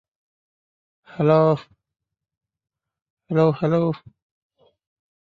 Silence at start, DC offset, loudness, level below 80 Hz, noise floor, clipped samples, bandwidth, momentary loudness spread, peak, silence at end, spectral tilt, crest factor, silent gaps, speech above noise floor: 1.15 s; under 0.1%; -20 LUFS; -64 dBFS; under -90 dBFS; under 0.1%; 6 kHz; 12 LU; -4 dBFS; 1.35 s; -9.5 dB/octave; 20 dB; 2.37-2.41 s, 3.02-3.17 s; over 71 dB